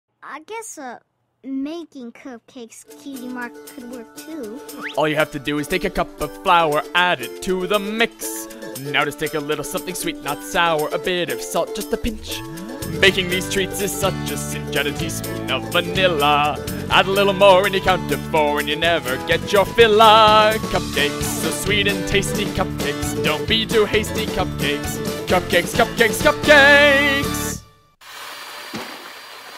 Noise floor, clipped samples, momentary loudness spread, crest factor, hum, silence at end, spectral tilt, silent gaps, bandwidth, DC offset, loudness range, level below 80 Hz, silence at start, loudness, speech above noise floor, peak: -46 dBFS; under 0.1%; 20 LU; 18 dB; none; 0 s; -3.5 dB/octave; none; 16 kHz; under 0.1%; 11 LU; -40 dBFS; 0.25 s; -18 LUFS; 28 dB; -2 dBFS